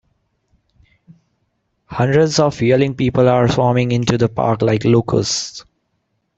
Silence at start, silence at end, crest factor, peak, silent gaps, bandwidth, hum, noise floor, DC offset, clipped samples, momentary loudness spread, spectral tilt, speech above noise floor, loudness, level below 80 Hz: 1.9 s; 0.75 s; 14 dB; -2 dBFS; none; 8.2 kHz; none; -69 dBFS; under 0.1%; under 0.1%; 7 LU; -6 dB/octave; 54 dB; -15 LUFS; -46 dBFS